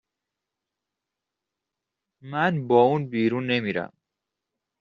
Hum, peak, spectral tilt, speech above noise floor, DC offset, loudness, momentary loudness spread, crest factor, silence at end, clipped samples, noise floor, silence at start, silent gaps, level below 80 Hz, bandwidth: none; -6 dBFS; -5 dB/octave; 63 dB; under 0.1%; -23 LUFS; 13 LU; 22 dB; 0.95 s; under 0.1%; -86 dBFS; 2.25 s; none; -70 dBFS; 6.8 kHz